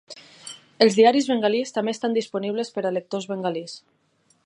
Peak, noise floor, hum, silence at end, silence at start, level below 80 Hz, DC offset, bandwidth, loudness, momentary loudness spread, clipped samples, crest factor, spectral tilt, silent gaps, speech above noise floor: -2 dBFS; -44 dBFS; none; 0.65 s; 0.1 s; -78 dBFS; under 0.1%; 11 kHz; -22 LUFS; 22 LU; under 0.1%; 22 dB; -4.5 dB/octave; none; 22 dB